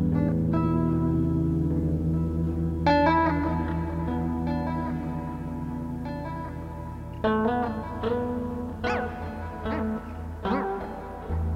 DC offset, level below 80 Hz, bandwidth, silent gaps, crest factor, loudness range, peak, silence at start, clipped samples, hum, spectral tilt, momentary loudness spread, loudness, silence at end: under 0.1%; -38 dBFS; 7 kHz; none; 18 dB; 6 LU; -10 dBFS; 0 s; under 0.1%; none; -9 dB/octave; 10 LU; -28 LUFS; 0 s